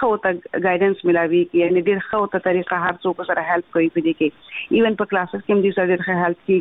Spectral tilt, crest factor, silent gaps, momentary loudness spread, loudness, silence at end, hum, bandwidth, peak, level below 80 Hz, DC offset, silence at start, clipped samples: -9.5 dB/octave; 14 dB; none; 5 LU; -19 LUFS; 0 s; none; 4 kHz; -6 dBFS; -58 dBFS; under 0.1%; 0 s; under 0.1%